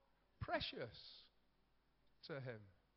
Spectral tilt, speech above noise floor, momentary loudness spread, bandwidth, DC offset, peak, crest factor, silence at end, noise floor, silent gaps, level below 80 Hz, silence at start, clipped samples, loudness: -3 dB/octave; 29 dB; 16 LU; 5.6 kHz; under 0.1%; -28 dBFS; 24 dB; 0.25 s; -79 dBFS; none; -70 dBFS; 0.4 s; under 0.1%; -49 LUFS